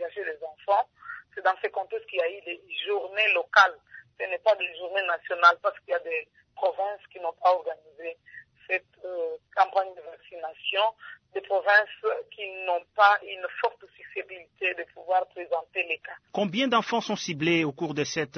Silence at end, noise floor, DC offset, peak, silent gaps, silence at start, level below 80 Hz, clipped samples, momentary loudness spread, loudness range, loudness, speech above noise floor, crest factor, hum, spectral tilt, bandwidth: 0 s; -51 dBFS; under 0.1%; -4 dBFS; none; 0 s; -76 dBFS; under 0.1%; 17 LU; 6 LU; -27 LUFS; 24 dB; 24 dB; none; -4 dB/octave; 6.6 kHz